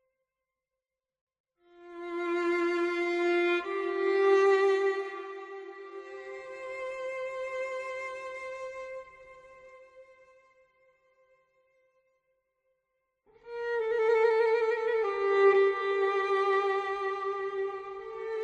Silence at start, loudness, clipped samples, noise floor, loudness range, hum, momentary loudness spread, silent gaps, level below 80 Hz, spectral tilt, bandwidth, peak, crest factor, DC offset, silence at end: 1.8 s; -29 LUFS; under 0.1%; under -90 dBFS; 15 LU; none; 19 LU; none; -74 dBFS; -3.5 dB/octave; 8.2 kHz; -14 dBFS; 18 dB; under 0.1%; 0 s